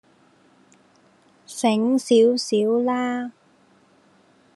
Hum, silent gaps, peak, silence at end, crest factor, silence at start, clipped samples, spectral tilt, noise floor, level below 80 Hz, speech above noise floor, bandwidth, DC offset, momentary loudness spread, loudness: none; none; -6 dBFS; 1.25 s; 18 dB; 1.5 s; under 0.1%; -4.5 dB/octave; -58 dBFS; -82 dBFS; 38 dB; 12.5 kHz; under 0.1%; 13 LU; -20 LUFS